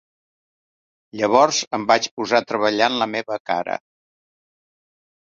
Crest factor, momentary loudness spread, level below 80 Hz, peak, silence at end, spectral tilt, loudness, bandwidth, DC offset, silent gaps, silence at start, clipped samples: 22 dB; 10 LU; -66 dBFS; 0 dBFS; 1.45 s; -2.5 dB/octave; -20 LUFS; 7.8 kHz; under 0.1%; 1.67-1.71 s, 2.11-2.17 s, 3.40-3.45 s; 1.15 s; under 0.1%